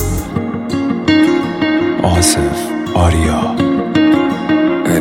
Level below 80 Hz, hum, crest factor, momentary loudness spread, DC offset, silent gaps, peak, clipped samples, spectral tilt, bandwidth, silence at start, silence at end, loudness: -28 dBFS; none; 14 dB; 7 LU; under 0.1%; none; 0 dBFS; under 0.1%; -5 dB/octave; 16.5 kHz; 0 s; 0 s; -14 LUFS